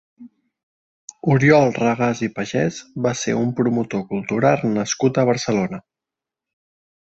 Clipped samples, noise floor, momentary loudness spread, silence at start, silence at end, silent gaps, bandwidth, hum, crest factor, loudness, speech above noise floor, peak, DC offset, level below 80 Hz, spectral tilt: under 0.1%; -87 dBFS; 10 LU; 0.2 s; 1.25 s; 0.63-1.08 s; 8.2 kHz; none; 18 dB; -19 LUFS; 68 dB; -2 dBFS; under 0.1%; -58 dBFS; -6 dB/octave